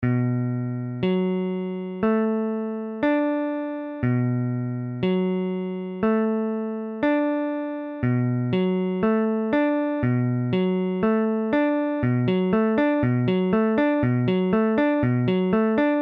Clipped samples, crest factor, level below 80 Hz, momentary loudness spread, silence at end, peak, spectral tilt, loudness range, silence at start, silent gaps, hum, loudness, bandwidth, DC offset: under 0.1%; 14 dB; -54 dBFS; 7 LU; 0 s; -8 dBFS; -10.5 dB/octave; 4 LU; 0 s; none; none; -23 LUFS; 5 kHz; under 0.1%